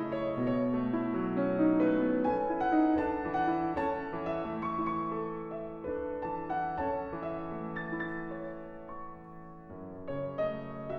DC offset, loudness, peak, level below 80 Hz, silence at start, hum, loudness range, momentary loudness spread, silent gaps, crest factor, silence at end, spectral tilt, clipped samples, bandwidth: under 0.1%; -33 LUFS; -16 dBFS; -56 dBFS; 0 s; none; 10 LU; 17 LU; none; 16 dB; 0 s; -9.5 dB/octave; under 0.1%; 4.9 kHz